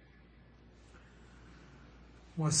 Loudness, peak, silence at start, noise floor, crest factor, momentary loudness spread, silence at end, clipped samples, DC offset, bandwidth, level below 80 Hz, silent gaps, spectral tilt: -35 LUFS; -18 dBFS; 0.95 s; -59 dBFS; 24 dB; 23 LU; 0 s; under 0.1%; under 0.1%; 9.4 kHz; -60 dBFS; none; -4 dB/octave